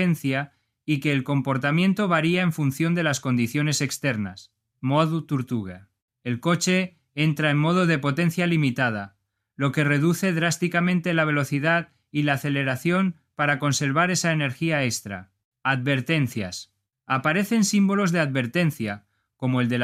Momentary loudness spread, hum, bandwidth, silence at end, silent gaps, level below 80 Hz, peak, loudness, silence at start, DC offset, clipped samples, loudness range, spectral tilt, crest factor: 10 LU; none; 15.5 kHz; 0 s; 6.02-6.08 s, 15.45-15.52 s; -64 dBFS; -6 dBFS; -23 LUFS; 0 s; under 0.1%; under 0.1%; 3 LU; -5.5 dB/octave; 18 dB